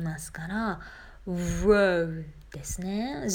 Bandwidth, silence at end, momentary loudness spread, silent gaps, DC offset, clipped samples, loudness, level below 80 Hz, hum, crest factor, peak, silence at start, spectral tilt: 18.5 kHz; 0 s; 19 LU; none; under 0.1%; under 0.1%; -28 LUFS; -42 dBFS; none; 18 dB; -10 dBFS; 0 s; -5.5 dB/octave